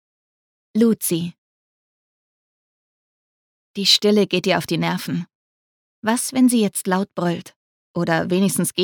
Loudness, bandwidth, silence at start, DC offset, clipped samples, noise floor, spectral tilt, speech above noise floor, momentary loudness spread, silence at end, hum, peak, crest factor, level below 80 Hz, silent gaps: -19 LUFS; 19 kHz; 0.75 s; under 0.1%; under 0.1%; under -90 dBFS; -4 dB/octave; over 71 dB; 13 LU; 0 s; none; -2 dBFS; 20 dB; -66 dBFS; 1.38-3.74 s, 5.35-6.02 s, 7.56-7.94 s